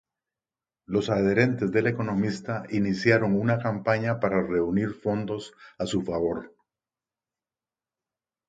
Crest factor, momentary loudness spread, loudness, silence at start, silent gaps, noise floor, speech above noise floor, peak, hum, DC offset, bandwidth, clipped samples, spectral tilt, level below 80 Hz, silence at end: 22 dB; 9 LU; -26 LUFS; 0.9 s; none; under -90 dBFS; over 65 dB; -6 dBFS; none; under 0.1%; 9.2 kHz; under 0.1%; -7 dB/octave; -56 dBFS; 2 s